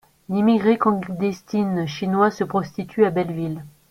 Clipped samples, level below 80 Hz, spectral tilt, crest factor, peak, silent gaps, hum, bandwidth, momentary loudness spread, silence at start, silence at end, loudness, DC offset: under 0.1%; -58 dBFS; -7.5 dB/octave; 18 dB; -4 dBFS; none; none; 14.5 kHz; 10 LU; 0.3 s; 0.2 s; -21 LUFS; under 0.1%